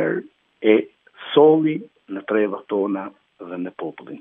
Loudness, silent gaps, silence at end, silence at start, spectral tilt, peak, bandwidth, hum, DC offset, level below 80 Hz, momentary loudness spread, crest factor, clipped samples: -20 LUFS; none; 0.05 s; 0 s; -9.5 dB/octave; -2 dBFS; 3.8 kHz; none; under 0.1%; -76 dBFS; 20 LU; 20 dB; under 0.1%